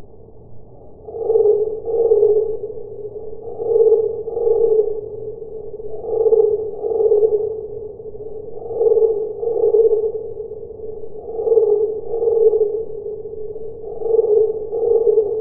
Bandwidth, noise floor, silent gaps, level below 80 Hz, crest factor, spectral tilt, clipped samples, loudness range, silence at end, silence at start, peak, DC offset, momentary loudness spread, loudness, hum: 1.3 kHz; -39 dBFS; none; -50 dBFS; 16 dB; -15.5 dB/octave; under 0.1%; 2 LU; 0 s; 0 s; -2 dBFS; under 0.1%; 17 LU; -17 LUFS; none